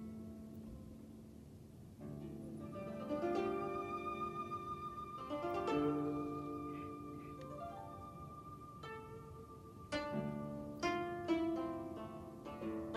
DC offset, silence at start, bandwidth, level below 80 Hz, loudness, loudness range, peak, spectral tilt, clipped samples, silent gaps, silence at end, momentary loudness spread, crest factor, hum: under 0.1%; 0 s; 13 kHz; -64 dBFS; -44 LUFS; 8 LU; -26 dBFS; -6.5 dB/octave; under 0.1%; none; 0 s; 16 LU; 18 dB; none